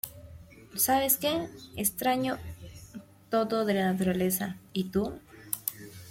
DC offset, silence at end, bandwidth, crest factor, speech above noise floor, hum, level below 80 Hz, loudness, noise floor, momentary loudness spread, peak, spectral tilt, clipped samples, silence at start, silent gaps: under 0.1%; 0 s; 16.5 kHz; 24 dB; 21 dB; none; -58 dBFS; -29 LUFS; -49 dBFS; 21 LU; -8 dBFS; -4 dB/octave; under 0.1%; 0.05 s; none